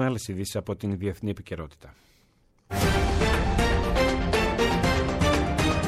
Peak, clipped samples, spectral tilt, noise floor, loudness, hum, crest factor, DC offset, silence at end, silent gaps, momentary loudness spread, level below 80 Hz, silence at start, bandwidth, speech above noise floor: -12 dBFS; under 0.1%; -5.5 dB/octave; -63 dBFS; -25 LUFS; none; 14 dB; under 0.1%; 0 s; none; 10 LU; -32 dBFS; 0 s; 16 kHz; 32 dB